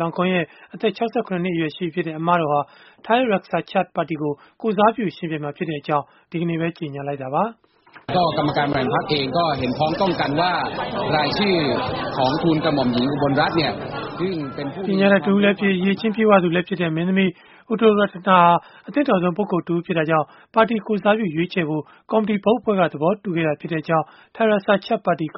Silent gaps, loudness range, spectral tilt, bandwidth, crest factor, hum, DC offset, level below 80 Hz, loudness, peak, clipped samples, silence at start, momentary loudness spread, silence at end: none; 5 LU; -4.5 dB/octave; 6 kHz; 18 dB; none; under 0.1%; -54 dBFS; -21 LUFS; -2 dBFS; under 0.1%; 0 s; 10 LU; 0 s